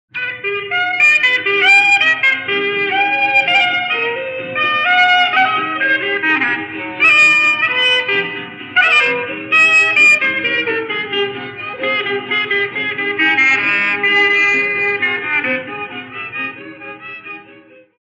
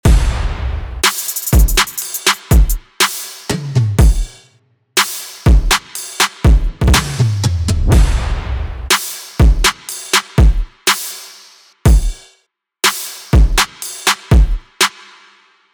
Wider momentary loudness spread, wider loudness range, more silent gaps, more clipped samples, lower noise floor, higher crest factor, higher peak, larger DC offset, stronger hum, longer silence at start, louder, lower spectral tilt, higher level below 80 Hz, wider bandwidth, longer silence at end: first, 16 LU vs 11 LU; first, 5 LU vs 2 LU; neither; neither; second, -43 dBFS vs -60 dBFS; about the same, 14 dB vs 14 dB; about the same, -2 dBFS vs 0 dBFS; neither; neither; about the same, 0.15 s vs 0.05 s; first, -12 LUFS vs -15 LUFS; second, -2 dB/octave vs -3.5 dB/octave; second, -66 dBFS vs -16 dBFS; second, 10.5 kHz vs over 20 kHz; second, 0.45 s vs 0.85 s